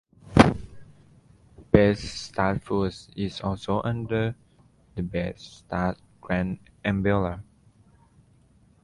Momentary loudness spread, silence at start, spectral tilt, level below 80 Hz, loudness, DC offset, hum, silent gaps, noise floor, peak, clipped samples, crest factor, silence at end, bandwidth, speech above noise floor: 15 LU; 0.25 s; -7 dB/octave; -42 dBFS; -26 LUFS; under 0.1%; none; none; -59 dBFS; 0 dBFS; under 0.1%; 26 dB; 1.4 s; 11.5 kHz; 32 dB